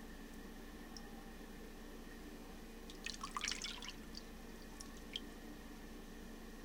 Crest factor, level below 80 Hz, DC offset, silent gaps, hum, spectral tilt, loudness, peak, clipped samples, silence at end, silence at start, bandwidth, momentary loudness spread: 28 dB; -56 dBFS; under 0.1%; none; 60 Hz at -65 dBFS; -2.5 dB/octave; -50 LUFS; -24 dBFS; under 0.1%; 0 s; 0 s; 18 kHz; 11 LU